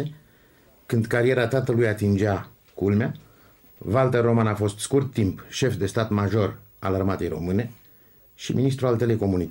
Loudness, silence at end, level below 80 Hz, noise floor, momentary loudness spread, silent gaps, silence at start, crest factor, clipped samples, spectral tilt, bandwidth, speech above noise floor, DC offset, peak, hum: -24 LUFS; 0 s; -52 dBFS; -56 dBFS; 9 LU; none; 0 s; 16 dB; under 0.1%; -6.5 dB/octave; 16.5 kHz; 33 dB; under 0.1%; -8 dBFS; none